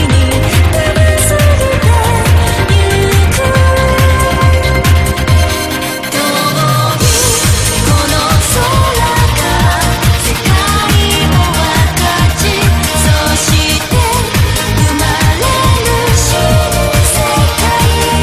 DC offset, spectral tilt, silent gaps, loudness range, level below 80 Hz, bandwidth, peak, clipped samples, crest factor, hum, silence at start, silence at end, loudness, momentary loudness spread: under 0.1%; -4 dB/octave; none; 1 LU; -16 dBFS; 15.5 kHz; 0 dBFS; 0.1%; 10 dB; none; 0 s; 0 s; -10 LUFS; 2 LU